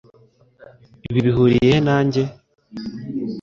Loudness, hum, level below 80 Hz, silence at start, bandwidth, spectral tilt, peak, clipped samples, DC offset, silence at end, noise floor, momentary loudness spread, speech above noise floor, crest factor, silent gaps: -18 LUFS; none; -46 dBFS; 1.1 s; 7.4 kHz; -7.5 dB/octave; -4 dBFS; under 0.1%; under 0.1%; 0 s; -54 dBFS; 18 LU; 38 dB; 16 dB; none